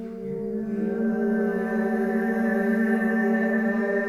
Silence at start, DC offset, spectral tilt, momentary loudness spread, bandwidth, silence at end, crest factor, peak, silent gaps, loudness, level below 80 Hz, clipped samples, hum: 0 s; under 0.1%; -8.5 dB/octave; 7 LU; 13.5 kHz; 0 s; 12 dB; -12 dBFS; none; -25 LUFS; -58 dBFS; under 0.1%; none